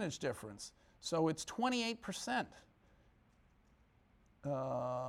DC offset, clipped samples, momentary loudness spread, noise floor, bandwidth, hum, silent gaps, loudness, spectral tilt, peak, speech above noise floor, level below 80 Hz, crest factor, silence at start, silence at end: under 0.1%; under 0.1%; 13 LU; -70 dBFS; 16 kHz; none; none; -40 LUFS; -4.5 dB/octave; -24 dBFS; 31 dB; -70 dBFS; 18 dB; 0 s; 0 s